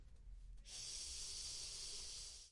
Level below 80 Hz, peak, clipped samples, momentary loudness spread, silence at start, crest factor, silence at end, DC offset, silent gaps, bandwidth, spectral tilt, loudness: -60 dBFS; -38 dBFS; under 0.1%; 15 LU; 0 s; 14 dB; 0 s; under 0.1%; none; 11.5 kHz; 0.5 dB/octave; -48 LUFS